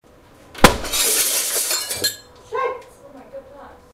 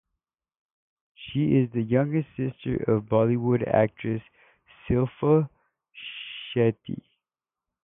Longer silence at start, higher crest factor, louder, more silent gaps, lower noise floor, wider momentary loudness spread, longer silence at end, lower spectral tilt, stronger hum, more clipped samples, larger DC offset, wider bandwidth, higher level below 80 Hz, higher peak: second, 0.55 s vs 1.2 s; about the same, 22 dB vs 18 dB; first, -18 LUFS vs -25 LUFS; neither; second, -48 dBFS vs under -90 dBFS; first, 24 LU vs 14 LU; second, 0.2 s vs 0.9 s; second, -2 dB/octave vs -12 dB/octave; neither; neither; neither; first, 16 kHz vs 3.8 kHz; first, -36 dBFS vs -54 dBFS; first, 0 dBFS vs -8 dBFS